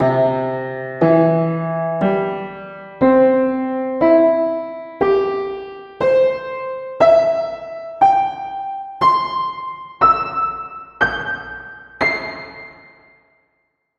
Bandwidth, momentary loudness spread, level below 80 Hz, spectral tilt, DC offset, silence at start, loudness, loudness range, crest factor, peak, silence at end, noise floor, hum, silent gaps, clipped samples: 6.8 kHz; 17 LU; -50 dBFS; -8 dB/octave; under 0.1%; 0 s; -17 LUFS; 3 LU; 16 dB; -2 dBFS; 1.25 s; -68 dBFS; none; none; under 0.1%